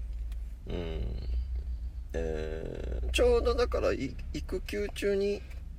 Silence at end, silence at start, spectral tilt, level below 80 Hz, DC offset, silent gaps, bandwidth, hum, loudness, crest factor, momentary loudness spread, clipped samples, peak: 0 s; 0 s; -6 dB/octave; -36 dBFS; under 0.1%; none; 15.5 kHz; none; -33 LUFS; 16 dB; 13 LU; under 0.1%; -16 dBFS